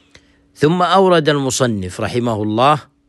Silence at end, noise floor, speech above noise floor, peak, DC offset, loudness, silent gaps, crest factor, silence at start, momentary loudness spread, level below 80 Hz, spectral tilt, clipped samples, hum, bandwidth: 0.25 s; -50 dBFS; 35 dB; -2 dBFS; under 0.1%; -15 LUFS; none; 14 dB; 0.6 s; 8 LU; -50 dBFS; -5 dB/octave; under 0.1%; none; 12.5 kHz